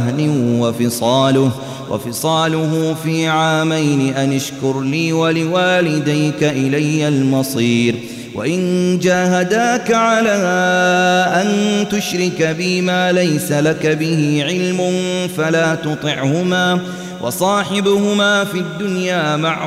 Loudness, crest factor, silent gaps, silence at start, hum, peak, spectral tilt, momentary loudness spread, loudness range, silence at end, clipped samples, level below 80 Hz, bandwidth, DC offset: -15 LUFS; 12 dB; none; 0 s; none; -4 dBFS; -5 dB/octave; 6 LU; 2 LU; 0 s; under 0.1%; -56 dBFS; 16 kHz; under 0.1%